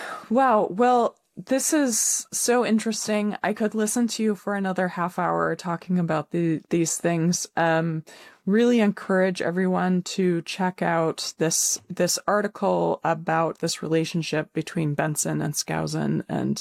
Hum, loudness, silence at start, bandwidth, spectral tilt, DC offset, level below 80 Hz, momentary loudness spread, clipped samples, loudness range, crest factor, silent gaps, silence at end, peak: none; -24 LUFS; 0 s; 16.5 kHz; -4.5 dB/octave; under 0.1%; -66 dBFS; 6 LU; under 0.1%; 3 LU; 14 dB; none; 0 s; -10 dBFS